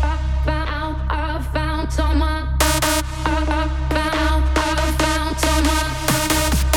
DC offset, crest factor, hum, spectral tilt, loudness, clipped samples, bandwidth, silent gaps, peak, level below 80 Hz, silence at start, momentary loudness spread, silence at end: under 0.1%; 16 dB; none; -4 dB/octave; -20 LUFS; under 0.1%; 18.5 kHz; none; -2 dBFS; -22 dBFS; 0 s; 6 LU; 0 s